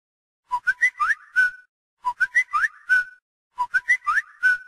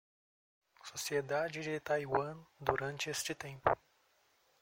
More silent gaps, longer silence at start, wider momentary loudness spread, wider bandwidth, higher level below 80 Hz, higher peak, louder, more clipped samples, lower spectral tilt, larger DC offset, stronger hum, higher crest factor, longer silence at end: first, 1.69-1.97 s, 3.22-3.50 s vs none; second, 0.5 s vs 0.85 s; first, 11 LU vs 7 LU; about the same, 15 kHz vs 16 kHz; about the same, -64 dBFS vs -66 dBFS; about the same, -10 dBFS vs -12 dBFS; first, -22 LUFS vs -37 LUFS; neither; second, 1.5 dB/octave vs -3.5 dB/octave; neither; neither; second, 14 dB vs 26 dB; second, 0.05 s vs 0.85 s